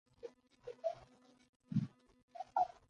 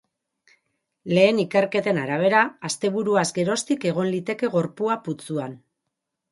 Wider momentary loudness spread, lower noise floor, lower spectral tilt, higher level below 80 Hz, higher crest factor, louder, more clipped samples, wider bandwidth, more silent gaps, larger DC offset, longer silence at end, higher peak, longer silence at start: first, 17 LU vs 11 LU; second, -65 dBFS vs -81 dBFS; first, -8.5 dB/octave vs -5 dB/octave; second, -78 dBFS vs -70 dBFS; about the same, 20 dB vs 20 dB; second, -43 LUFS vs -22 LUFS; neither; second, 9.6 kHz vs 11.5 kHz; first, 1.49-1.60 s, 2.23-2.28 s vs none; neither; second, 0.25 s vs 0.75 s; second, -24 dBFS vs -4 dBFS; second, 0.25 s vs 1.05 s